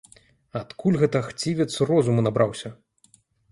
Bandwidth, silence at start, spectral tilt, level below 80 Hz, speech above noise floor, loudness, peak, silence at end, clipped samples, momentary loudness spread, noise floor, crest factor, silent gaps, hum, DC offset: 11.5 kHz; 0.55 s; -6.5 dB/octave; -58 dBFS; 38 dB; -23 LUFS; -6 dBFS; 0.75 s; under 0.1%; 15 LU; -60 dBFS; 18 dB; none; none; under 0.1%